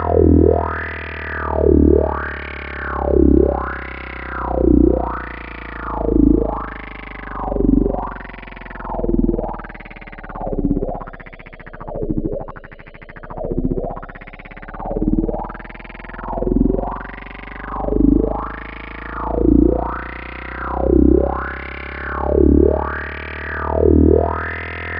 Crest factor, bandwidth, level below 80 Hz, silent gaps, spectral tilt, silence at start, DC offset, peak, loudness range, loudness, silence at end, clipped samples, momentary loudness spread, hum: 18 dB; 5 kHz; -24 dBFS; none; -13 dB/octave; 0 s; under 0.1%; 0 dBFS; 9 LU; -19 LUFS; 0 s; under 0.1%; 20 LU; none